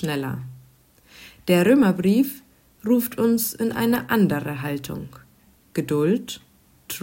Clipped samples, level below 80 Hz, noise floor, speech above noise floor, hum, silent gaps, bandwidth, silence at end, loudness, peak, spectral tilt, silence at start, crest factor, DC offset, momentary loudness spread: under 0.1%; -58 dBFS; -56 dBFS; 35 dB; none; none; 16.5 kHz; 0 s; -22 LUFS; -6 dBFS; -6 dB/octave; 0 s; 18 dB; under 0.1%; 18 LU